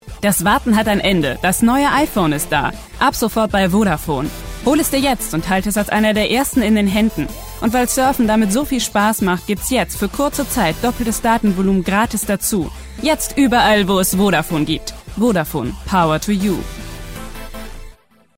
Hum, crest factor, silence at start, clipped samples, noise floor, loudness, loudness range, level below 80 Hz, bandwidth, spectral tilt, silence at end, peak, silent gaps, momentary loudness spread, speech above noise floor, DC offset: none; 12 dB; 0.05 s; under 0.1%; -43 dBFS; -16 LUFS; 2 LU; -34 dBFS; 16.5 kHz; -4.5 dB/octave; 0.45 s; -4 dBFS; none; 10 LU; 27 dB; under 0.1%